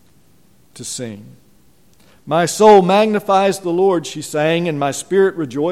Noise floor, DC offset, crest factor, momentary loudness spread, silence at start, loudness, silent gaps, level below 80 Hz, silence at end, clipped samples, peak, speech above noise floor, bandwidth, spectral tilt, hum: -54 dBFS; 0.3%; 16 dB; 17 LU; 0.75 s; -15 LUFS; none; -60 dBFS; 0 s; under 0.1%; 0 dBFS; 39 dB; 15 kHz; -5 dB/octave; none